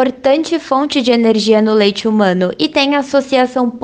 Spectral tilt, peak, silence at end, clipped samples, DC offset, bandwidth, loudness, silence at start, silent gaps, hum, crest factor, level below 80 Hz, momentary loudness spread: -5 dB/octave; 0 dBFS; 0.05 s; under 0.1%; under 0.1%; 9.6 kHz; -13 LUFS; 0 s; none; none; 12 dB; -54 dBFS; 4 LU